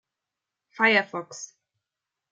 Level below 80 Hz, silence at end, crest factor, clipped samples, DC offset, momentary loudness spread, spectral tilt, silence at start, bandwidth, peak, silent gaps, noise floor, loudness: -86 dBFS; 0.85 s; 24 dB; under 0.1%; under 0.1%; 20 LU; -3 dB/octave; 0.8 s; 9.4 kHz; -6 dBFS; none; -87 dBFS; -22 LUFS